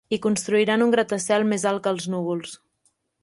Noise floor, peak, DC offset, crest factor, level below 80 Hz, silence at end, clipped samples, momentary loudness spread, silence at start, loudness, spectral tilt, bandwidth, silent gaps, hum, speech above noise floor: -69 dBFS; -8 dBFS; under 0.1%; 16 dB; -66 dBFS; 0.65 s; under 0.1%; 9 LU; 0.1 s; -22 LUFS; -4.5 dB/octave; 11.5 kHz; none; none; 47 dB